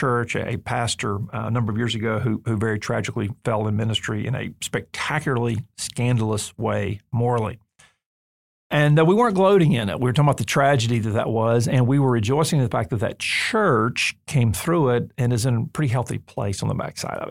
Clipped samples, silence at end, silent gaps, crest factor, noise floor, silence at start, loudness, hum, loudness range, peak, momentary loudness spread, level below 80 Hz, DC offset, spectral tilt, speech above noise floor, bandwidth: under 0.1%; 0 s; 8.06-8.70 s; 16 dB; under -90 dBFS; 0 s; -22 LUFS; none; 6 LU; -6 dBFS; 9 LU; -52 dBFS; 0.2%; -5.5 dB/octave; over 69 dB; 16 kHz